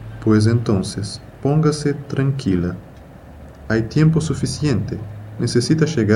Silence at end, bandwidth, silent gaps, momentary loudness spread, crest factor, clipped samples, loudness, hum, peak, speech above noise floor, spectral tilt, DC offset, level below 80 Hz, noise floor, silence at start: 0 s; 12 kHz; none; 12 LU; 18 dB; under 0.1%; -19 LUFS; none; 0 dBFS; 22 dB; -6.5 dB/octave; under 0.1%; -42 dBFS; -39 dBFS; 0 s